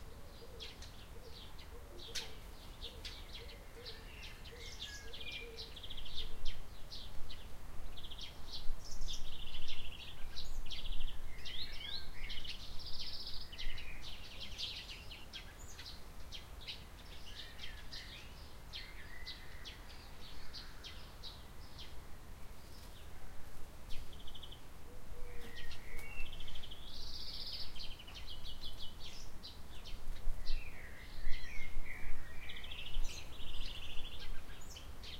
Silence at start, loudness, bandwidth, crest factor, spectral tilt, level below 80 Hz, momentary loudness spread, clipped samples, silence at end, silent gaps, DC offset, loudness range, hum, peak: 0 s; -49 LUFS; 13 kHz; 20 dB; -3 dB/octave; -44 dBFS; 9 LU; under 0.1%; 0 s; none; under 0.1%; 7 LU; none; -16 dBFS